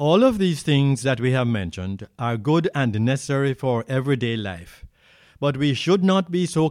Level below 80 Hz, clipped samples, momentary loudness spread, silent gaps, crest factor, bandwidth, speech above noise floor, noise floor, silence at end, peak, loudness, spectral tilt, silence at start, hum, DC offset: -52 dBFS; under 0.1%; 10 LU; none; 16 dB; 13.5 kHz; 33 dB; -54 dBFS; 0 s; -4 dBFS; -22 LUFS; -6.5 dB/octave; 0 s; none; under 0.1%